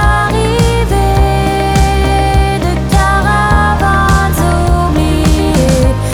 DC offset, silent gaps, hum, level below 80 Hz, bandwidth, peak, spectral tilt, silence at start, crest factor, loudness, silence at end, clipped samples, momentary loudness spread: under 0.1%; none; none; -14 dBFS; 16.5 kHz; 0 dBFS; -5.5 dB/octave; 0 s; 8 dB; -11 LUFS; 0 s; under 0.1%; 2 LU